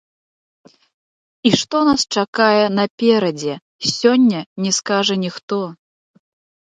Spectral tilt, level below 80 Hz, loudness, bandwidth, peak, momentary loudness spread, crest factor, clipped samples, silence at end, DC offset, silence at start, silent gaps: -4 dB/octave; -60 dBFS; -17 LUFS; 9.4 kHz; 0 dBFS; 10 LU; 18 dB; under 0.1%; 0.9 s; under 0.1%; 1.45 s; 2.28-2.33 s, 2.90-2.98 s, 3.62-3.79 s, 4.46-4.56 s, 5.43-5.48 s